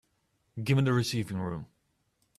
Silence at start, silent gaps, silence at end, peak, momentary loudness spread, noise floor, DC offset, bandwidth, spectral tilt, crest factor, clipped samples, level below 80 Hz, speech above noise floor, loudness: 0.55 s; none; 0.75 s; -14 dBFS; 15 LU; -74 dBFS; under 0.1%; 13.5 kHz; -6 dB/octave; 18 dB; under 0.1%; -62 dBFS; 46 dB; -30 LUFS